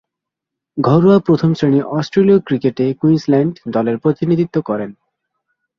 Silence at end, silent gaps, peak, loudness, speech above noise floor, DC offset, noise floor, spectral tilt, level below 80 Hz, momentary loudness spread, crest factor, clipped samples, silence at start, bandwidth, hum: 0.85 s; none; -2 dBFS; -15 LUFS; 68 dB; under 0.1%; -82 dBFS; -9 dB/octave; -54 dBFS; 8 LU; 14 dB; under 0.1%; 0.75 s; 7 kHz; none